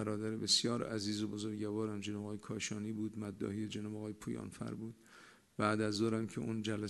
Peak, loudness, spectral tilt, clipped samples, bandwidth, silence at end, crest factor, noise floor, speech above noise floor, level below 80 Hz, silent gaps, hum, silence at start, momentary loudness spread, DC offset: -16 dBFS; -38 LUFS; -4.5 dB/octave; under 0.1%; 12 kHz; 0 s; 22 dB; -61 dBFS; 23 dB; -72 dBFS; none; none; 0 s; 13 LU; under 0.1%